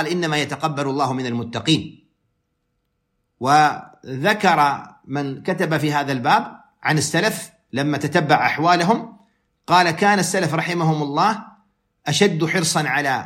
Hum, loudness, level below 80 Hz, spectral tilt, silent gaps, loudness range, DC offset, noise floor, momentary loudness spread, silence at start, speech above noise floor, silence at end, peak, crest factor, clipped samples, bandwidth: none; -19 LUFS; -64 dBFS; -4.5 dB/octave; none; 4 LU; under 0.1%; -72 dBFS; 11 LU; 0 s; 53 dB; 0 s; -2 dBFS; 18 dB; under 0.1%; 16.5 kHz